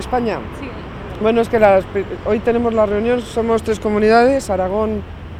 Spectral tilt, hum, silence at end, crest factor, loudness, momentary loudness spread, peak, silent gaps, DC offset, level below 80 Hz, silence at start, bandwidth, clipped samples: -6 dB/octave; none; 0 s; 16 dB; -16 LUFS; 14 LU; 0 dBFS; none; under 0.1%; -36 dBFS; 0 s; 14 kHz; under 0.1%